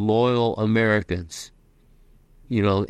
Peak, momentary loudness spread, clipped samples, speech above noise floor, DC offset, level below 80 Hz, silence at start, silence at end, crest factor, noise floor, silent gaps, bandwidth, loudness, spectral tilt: -6 dBFS; 17 LU; under 0.1%; 34 dB; under 0.1%; -50 dBFS; 0 s; 0 s; 16 dB; -55 dBFS; none; 13 kHz; -22 LUFS; -6.5 dB/octave